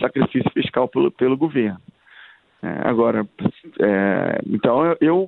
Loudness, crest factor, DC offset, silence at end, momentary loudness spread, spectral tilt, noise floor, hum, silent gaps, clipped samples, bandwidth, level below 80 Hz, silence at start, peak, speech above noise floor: -20 LUFS; 18 dB; under 0.1%; 0 s; 8 LU; -10.5 dB/octave; -48 dBFS; none; none; under 0.1%; 4.2 kHz; -58 dBFS; 0 s; -2 dBFS; 29 dB